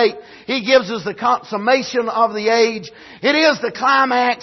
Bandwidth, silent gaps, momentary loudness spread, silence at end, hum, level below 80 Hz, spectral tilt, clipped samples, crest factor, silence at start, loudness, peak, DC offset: 6.2 kHz; none; 9 LU; 0 s; none; -64 dBFS; -3.5 dB/octave; under 0.1%; 14 dB; 0 s; -16 LUFS; -2 dBFS; under 0.1%